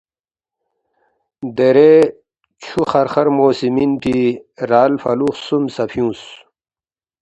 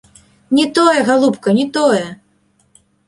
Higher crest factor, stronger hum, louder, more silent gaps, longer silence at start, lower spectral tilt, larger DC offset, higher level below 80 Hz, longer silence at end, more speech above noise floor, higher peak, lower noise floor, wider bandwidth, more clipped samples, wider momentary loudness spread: about the same, 16 dB vs 14 dB; neither; about the same, -15 LUFS vs -14 LUFS; neither; first, 1.4 s vs 0.5 s; first, -7 dB/octave vs -4.5 dB/octave; neither; first, -52 dBFS vs -58 dBFS; about the same, 0.85 s vs 0.95 s; first, over 76 dB vs 45 dB; about the same, 0 dBFS vs -2 dBFS; first, under -90 dBFS vs -58 dBFS; second, 10 kHz vs 11.5 kHz; neither; first, 15 LU vs 6 LU